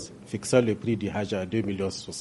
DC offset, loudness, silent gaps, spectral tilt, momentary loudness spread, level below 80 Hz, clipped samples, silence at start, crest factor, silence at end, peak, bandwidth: under 0.1%; -28 LUFS; none; -5.5 dB/octave; 9 LU; -60 dBFS; under 0.1%; 0 s; 22 dB; 0 s; -6 dBFS; 11.5 kHz